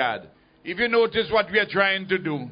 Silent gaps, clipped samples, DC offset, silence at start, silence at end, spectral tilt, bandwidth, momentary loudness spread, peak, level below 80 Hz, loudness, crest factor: none; under 0.1%; under 0.1%; 0 s; 0 s; -9 dB/octave; 5.2 kHz; 13 LU; -6 dBFS; -56 dBFS; -22 LUFS; 18 dB